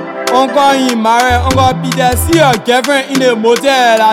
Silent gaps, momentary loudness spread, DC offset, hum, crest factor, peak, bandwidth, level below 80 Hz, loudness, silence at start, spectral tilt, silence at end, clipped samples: none; 3 LU; under 0.1%; none; 10 dB; 0 dBFS; 19 kHz; -28 dBFS; -10 LUFS; 0 s; -4.5 dB/octave; 0 s; under 0.1%